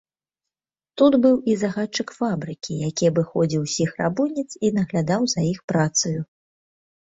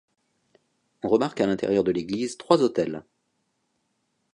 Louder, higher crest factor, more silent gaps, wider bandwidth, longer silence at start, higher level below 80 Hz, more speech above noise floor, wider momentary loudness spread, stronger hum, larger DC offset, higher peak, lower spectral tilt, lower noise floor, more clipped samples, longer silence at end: about the same, -22 LUFS vs -24 LUFS; second, 18 dB vs 24 dB; first, 5.64-5.68 s vs none; second, 8 kHz vs 10.5 kHz; about the same, 0.95 s vs 1.05 s; about the same, -58 dBFS vs -62 dBFS; first, 68 dB vs 51 dB; about the same, 9 LU vs 9 LU; neither; neither; about the same, -4 dBFS vs -4 dBFS; about the same, -5 dB/octave vs -6 dB/octave; first, -90 dBFS vs -74 dBFS; neither; second, 0.85 s vs 1.3 s